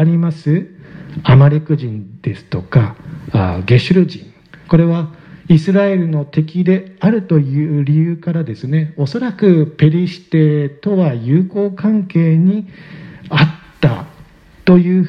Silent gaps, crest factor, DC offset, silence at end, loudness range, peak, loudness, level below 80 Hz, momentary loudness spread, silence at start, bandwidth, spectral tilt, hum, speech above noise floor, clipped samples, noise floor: none; 14 dB; under 0.1%; 0 s; 2 LU; 0 dBFS; -14 LUFS; -44 dBFS; 13 LU; 0 s; 6.2 kHz; -9.5 dB/octave; none; 29 dB; under 0.1%; -42 dBFS